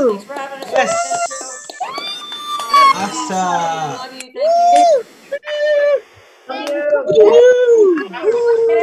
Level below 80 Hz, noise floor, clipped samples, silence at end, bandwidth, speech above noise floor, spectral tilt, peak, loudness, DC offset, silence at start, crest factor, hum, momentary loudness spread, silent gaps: -64 dBFS; -42 dBFS; under 0.1%; 0 s; 14 kHz; 25 dB; -3 dB/octave; 0 dBFS; -14 LUFS; under 0.1%; 0 s; 14 dB; none; 17 LU; none